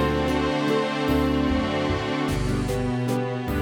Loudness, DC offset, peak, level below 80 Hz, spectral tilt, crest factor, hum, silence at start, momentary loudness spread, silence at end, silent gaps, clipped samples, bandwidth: -24 LUFS; under 0.1%; -10 dBFS; -36 dBFS; -6.5 dB/octave; 12 dB; none; 0 s; 3 LU; 0 s; none; under 0.1%; 19 kHz